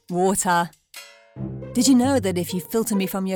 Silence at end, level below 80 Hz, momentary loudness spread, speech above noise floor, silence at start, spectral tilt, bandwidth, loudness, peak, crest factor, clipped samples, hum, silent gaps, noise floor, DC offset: 0 s; -54 dBFS; 19 LU; 24 dB; 0.1 s; -4.5 dB/octave; over 20 kHz; -21 LUFS; -8 dBFS; 14 dB; under 0.1%; none; none; -44 dBFS; under 0.1%